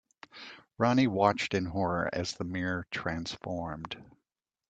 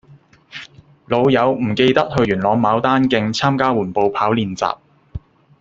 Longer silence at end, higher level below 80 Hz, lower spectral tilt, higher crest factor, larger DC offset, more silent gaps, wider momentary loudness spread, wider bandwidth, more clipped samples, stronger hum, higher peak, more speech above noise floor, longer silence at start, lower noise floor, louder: first, 0.65 s vs 0.45 s; second, -60 dBFS vs -48 dBFS; about the same, -5.5 dB/octave vs -6 dB/octave; first, 22 dB vs 16 dB; neither; neither; about the same, 20 LU vs 20 LU; first, 9 kHz vs 7.8 kHz; neither; neither; second, -10 dBFS vs -2 dBFS; first, 57 dB vs 32 dB; first, 0.35 s vs 0.1 s; first, -87 dBFS vs -48 dBFS; second, -31 LUFS vs -17 LUFS